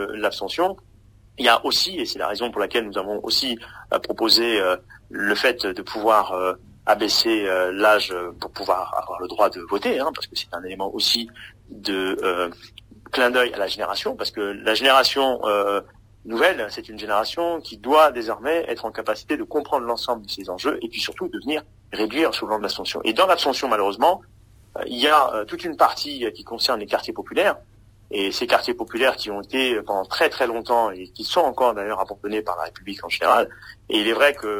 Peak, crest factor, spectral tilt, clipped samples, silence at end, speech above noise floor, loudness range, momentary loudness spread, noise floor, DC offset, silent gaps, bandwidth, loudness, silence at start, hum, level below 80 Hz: 0 dBFS; 22 dB; -2.5 dB/octave; under 0.1%; 0 s; 29 dB; 4 LU; 12 LU; -51 dBFS; under 0.1%; none; 16 kHz; -22 LUFS; 0 s; none; -56 dBFS